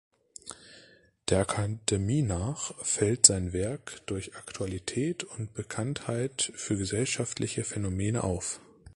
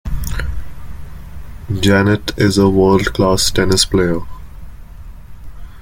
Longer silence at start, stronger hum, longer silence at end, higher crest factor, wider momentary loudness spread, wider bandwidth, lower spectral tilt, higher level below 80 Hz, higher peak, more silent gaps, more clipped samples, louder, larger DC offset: first, 0.45 s vs 0.05 s; neither; about the same, 0.05 s vs 0 s; first, 28 dB vs 16 dB; second, 11 LU vs 23 LU; second, 11.5 kHz vs 17 kHz; about the same, -4 dB/octave vs -5 dB/octave; second, -48 dBFS vs -28 dBFS; about the same, -2 dBFS vs 0 dBFS; neither; neither; second, -29 LUFS vs -14 LUFS; neither